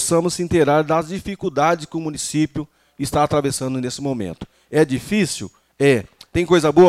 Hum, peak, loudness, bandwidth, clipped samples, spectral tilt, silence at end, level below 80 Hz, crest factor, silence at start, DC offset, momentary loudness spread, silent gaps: none; -4 dBFS; -20 LUFS; 14.5 kHz; under 0.1%; -5 dB/octave; 0 s; -46 dBFS; 16 dB; 0 s; under 0.1%; 12 LU; none